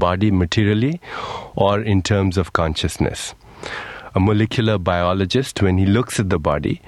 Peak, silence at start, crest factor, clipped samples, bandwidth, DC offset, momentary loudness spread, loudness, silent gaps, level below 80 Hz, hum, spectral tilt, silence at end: 0 dBFS; 0 s; 18 dB; under 0.1%; 12.5 kHz; under 0.1%; 12 LU; -19 LUFS; none; -38 dBFS; none; -6 dB/octave; 0.1 s